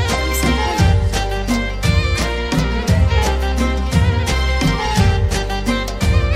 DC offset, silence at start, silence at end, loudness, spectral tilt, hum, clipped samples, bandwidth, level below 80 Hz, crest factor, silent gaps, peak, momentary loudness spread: under 0.1%; 0 s; 0 s; -17 LUFS; -5 dB/octave; none; under 0.1%; 16 kHz; -20 dBFS; 14 dB; none; -2 dBFS; 4 LU